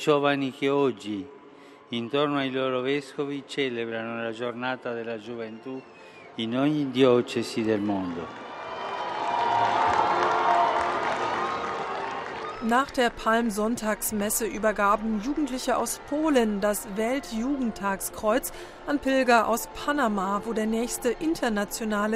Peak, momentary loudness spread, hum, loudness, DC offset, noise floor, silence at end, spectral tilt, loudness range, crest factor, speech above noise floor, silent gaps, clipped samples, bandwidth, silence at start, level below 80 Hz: -6 dBFS; 12 LU; none; -26 LUFS; under 0.1%; -49 dBFS; 0 s; -4 dB/octave; 4 LU; 20 dB; 23 dB; none; under 0.1%; 16 kHz; 0 s; -52 dBFS